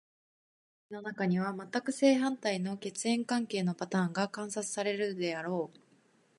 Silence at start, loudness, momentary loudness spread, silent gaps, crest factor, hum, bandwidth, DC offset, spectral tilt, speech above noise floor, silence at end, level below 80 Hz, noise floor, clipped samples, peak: 0.9 s; -33 LUFS; 9 LU; none; 20 dB; none; 11.5 kHz; under 0.1%; -5 dB/octave; 35 dB; 0.7 s; -80 dBFS; -67 dBFS; under 0.1%; -14 dBFS